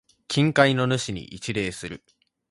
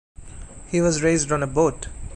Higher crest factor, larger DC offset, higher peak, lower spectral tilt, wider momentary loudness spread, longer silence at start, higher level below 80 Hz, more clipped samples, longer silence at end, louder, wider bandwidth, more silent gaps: first, 22 dB vs 16 dB; neither; first, -2 dBFS vs -6 dBFS; about the same, -5 dB/octave vs -5 dB/octave; second, 17 LU vs 22 LU; about the same, 0.3 s vs 0.2 s; second, -54 dBFS vs -40 dBFS; neither; first, 0.55 s vs 0 s; about the same, -23 LUFS vs -21 LUFS; about the same, 11.5 kHz vs 11 kHz; neither